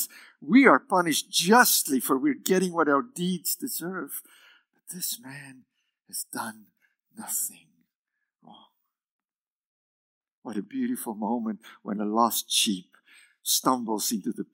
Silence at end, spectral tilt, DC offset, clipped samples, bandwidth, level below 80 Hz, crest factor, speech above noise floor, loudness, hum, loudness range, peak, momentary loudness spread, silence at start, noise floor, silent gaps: 0.1 s; -3 dB/octave; under 0.1%; under 0.1%; 16.5 kHz; under -90 dBFS; 24 dB; over 64 dB; -25 LUFS; none; 16 LU; -2 dBFS; 18 LU; 0 s; under -90 dBFS; 7.95-8.05 s, 9.11-9.19 s, 9.41-10.21 s, 10.33-10.42 s